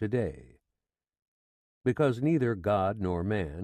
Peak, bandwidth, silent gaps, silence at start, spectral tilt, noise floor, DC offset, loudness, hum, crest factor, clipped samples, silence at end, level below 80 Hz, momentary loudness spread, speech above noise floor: -14 dBFS; 12 kHz; 1.22-1.81 s; 0 s; -8.5 dB/octave; -89 dBFS; under 0.1%; -29 LUFS; none; 16 dB; under 0.1%; 0 s; -50 dBFS; 5 LU; 60 dB